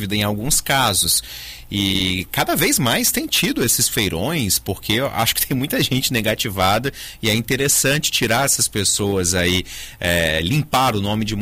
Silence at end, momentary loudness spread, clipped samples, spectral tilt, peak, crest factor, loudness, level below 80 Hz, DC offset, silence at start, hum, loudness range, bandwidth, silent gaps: 0 s; 6 LU; under 0.1%; -3 dB/octave; -4 dBFS; 14 dB; -18 LUFS; -40 dBFS; under 0.1%; 0 s; none; 1 LU; 16 kHz; none